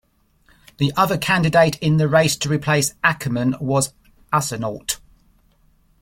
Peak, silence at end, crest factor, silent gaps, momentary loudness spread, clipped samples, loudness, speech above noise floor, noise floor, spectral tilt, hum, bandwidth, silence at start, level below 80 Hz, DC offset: -2 dBFS; 1.05 s; 18 dB; none; 10 LU; under 0.1%; -19 LUFS; 40 dB; -58 dBFS; -4.5 dB/octave; none; 16.5 kHz; 0.8 s; -50 dBFS; under 0.1%